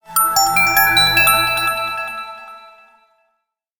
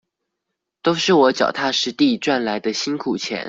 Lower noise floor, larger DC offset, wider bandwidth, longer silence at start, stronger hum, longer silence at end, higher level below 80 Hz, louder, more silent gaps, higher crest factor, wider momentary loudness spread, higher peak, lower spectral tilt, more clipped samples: second, -72 dBFS vs -80 dBFS; neither; first, 19.5 kHz vs 7.8 kHz; second, 0.1 s vs 0.85 s; neither; first, 1.15 s vs 0 s; first, -44 dBFS vs -62 dBFS; first, -13 LUFS vs -19 LUFS; neither; about the same, 16 dB vs 18 dB; first, 17 LU vs 8 LU; about the same, -2 dBFS vs -2 dBFS; second, -0.5 dB/octave vs -4 dB/octave; neither